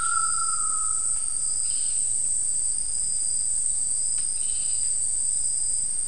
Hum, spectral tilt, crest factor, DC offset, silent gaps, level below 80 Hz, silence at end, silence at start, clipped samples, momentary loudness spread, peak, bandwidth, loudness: none; 1.5 dB/octave; 14 dB; 3%; none; -50 dBFS; 0 s; 0 s; under 0.1%; 1 LU; -10 dBFS; 12 kHz; -23 LUFS